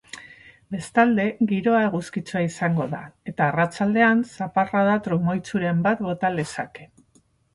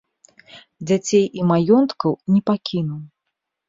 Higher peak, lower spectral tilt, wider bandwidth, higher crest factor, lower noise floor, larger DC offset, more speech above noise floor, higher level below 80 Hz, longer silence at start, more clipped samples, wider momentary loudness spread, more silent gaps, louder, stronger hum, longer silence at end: about the same, -6 dBFS vs -4 dBFS; about the same, -7 dB/octave vs -6.5 dB/octave; first, 11.5 kHz vs 7.8 kHz; about the same, 16 dB vs 16 dB; second, -61 dBFS vs -79 dBFS; neither; second, 39 dB vs 61 dB; about the same, -60 dBFS vs -62 dBFS; second, 0.15 s vs 0.55 s; neither; about the same, 14 LU vs 12 LU; neither; second, -22 LUFS vs -19 LUFS; neither; about the same, 0.7 s vs 0.65 s